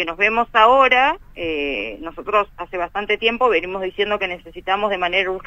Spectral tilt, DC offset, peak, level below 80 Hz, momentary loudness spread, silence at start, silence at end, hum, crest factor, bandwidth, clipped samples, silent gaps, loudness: -4.5 dB/octave; under 0.1%; 0 dBFS; -44 dBFS; 13 LU; 0 s; 0 s; none; 18 dB; 8.8 kHz; under 0.1%; none; -18 LUFS